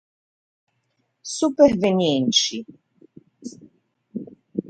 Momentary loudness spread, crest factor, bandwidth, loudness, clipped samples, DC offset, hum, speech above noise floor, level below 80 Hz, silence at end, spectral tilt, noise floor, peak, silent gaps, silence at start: 23 LU; 22 dB; 9.2 kHz; -19 LUFS; under 0.1%; under 0.1%; none; 52 dB; -60 dBFS; 0.1 s; -4 dB/octave; -72 dBFS; -2 dBFS; none; 1.25 s